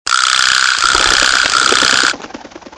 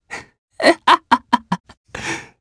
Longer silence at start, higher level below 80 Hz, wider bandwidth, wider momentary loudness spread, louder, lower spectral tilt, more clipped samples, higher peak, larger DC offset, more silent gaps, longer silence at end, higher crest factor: about the same, 0.05 s vs 0.1 s; first, -40 dBFS vs -52 dBFS; about the same, 11 kHz vs 11 kHz; second, 5 LU vs 20 LU; first, -10 LUFS vs -17 LUFS; second, 1 dB/octave vs -3.5 dB/octave; first, 0.8% vs under 0.1%; about the same, 0 dBFS vs 0 dBFS; neither; second, none vs 0.38-0.48 s, 1.60-1.64 s, 1.77-1.84 s; about the same, 0.1 s vs 0.2 s; second, 12 dB vs 20 dB